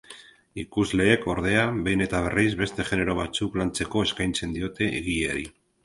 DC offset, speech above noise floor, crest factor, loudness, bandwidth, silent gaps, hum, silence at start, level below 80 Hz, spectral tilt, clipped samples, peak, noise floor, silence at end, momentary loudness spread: under 0.1%; 24 dB; 22 dB; -25 LUFS; 11.5 kHz; none; none; 0.1 s; -44 dBFS; -5 dB/octave; under 0.1%; -4 dBFS; -49 dBFS; 0.35 s; 10 LU